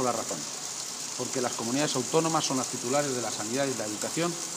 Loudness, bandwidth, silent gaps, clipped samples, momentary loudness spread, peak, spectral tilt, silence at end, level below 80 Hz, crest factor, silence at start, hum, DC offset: -29 LUFS; 15.5 kHz; none; under 0.1%; 7 LU; -10 dBFS; -3 dB/octave; 0 s; -76 dBFS; 18 dB; 0 s; none; under 0.1%